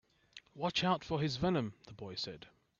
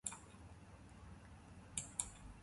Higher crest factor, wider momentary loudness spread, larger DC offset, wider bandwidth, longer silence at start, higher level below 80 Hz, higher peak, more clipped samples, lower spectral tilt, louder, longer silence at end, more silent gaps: second, 20 dB vs 32 dB; first, 21 LU vs 16 LU; neither; second, 7.6 kHz vs 11.5 kHz; first, 0.35 s vs 0.05 s; about the same, -64 dBFS vs -62 dBFS; about the same, -18 dBFS vs -20 dBFS; neither; first, -5.5 dB/octave vs -2 dB/octave; first, -36 LUFS vs -49 LUFS; first, 0.35 s vs 0 s; neither